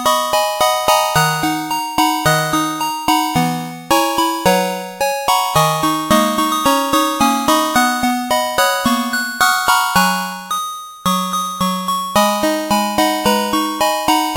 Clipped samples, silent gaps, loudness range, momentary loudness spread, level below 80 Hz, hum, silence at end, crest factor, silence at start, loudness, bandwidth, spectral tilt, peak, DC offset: under 0.1%; none; 2 LU; 6 LU; -46 dBFS; none; 0 s; 16 dB; 0 s; -15 LUFS; 17 kHz; -3 dB/octave; 0 dBFS; under 0.1%